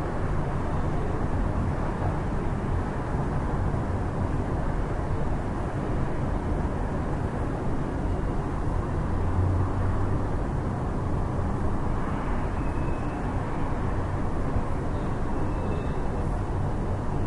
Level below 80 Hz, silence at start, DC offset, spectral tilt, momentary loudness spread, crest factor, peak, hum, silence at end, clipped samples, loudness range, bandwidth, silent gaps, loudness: -32 dBFS; 0 s; under 0.1%; -8.5 dB/octave; 2 LU; 14 dB; -12 dBFS; none; 0 s; under 0.1%; 2 LU; 11 kHz; none; -29 LUFS